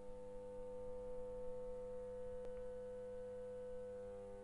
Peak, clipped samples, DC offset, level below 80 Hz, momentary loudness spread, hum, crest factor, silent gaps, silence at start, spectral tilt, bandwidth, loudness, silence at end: -36 dBFS; under 0.1%; under 0.1%; -60 dBFS; 3 LU; none; 12 dB; none; 0 s; -7 dB/octave; 11 kHz; -51 LUFS; 0 s